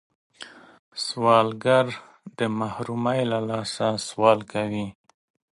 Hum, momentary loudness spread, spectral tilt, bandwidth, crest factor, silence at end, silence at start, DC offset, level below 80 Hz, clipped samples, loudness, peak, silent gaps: none; 21 LU; -5 dB/octave; 11.5 kHz; 24 dB; 0.7 s; 0.4 s; under 0.1%; -64 dBFS; under 0.1%; -24 LUFS; -2 dBFS; 0.79-0.92 s